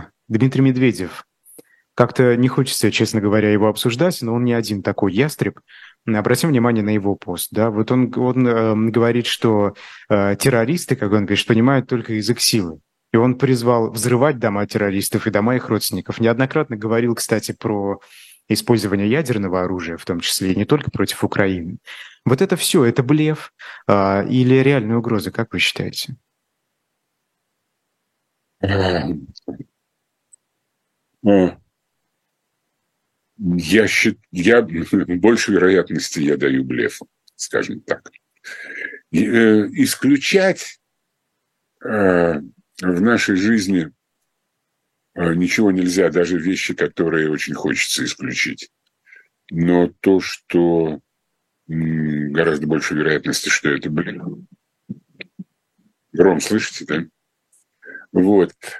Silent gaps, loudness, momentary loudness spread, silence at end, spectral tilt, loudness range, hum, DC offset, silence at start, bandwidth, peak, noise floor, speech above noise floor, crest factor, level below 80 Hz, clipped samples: none; -18 LUFS; 13 LU; 0 s; -5 dB/octave; 6 LU; none; under 0.1%; 0 s; 13.5 kHz; 0 dBFS; -74 dBFS; 57 dB; 18 dB; -54 dBFS; under 0.1%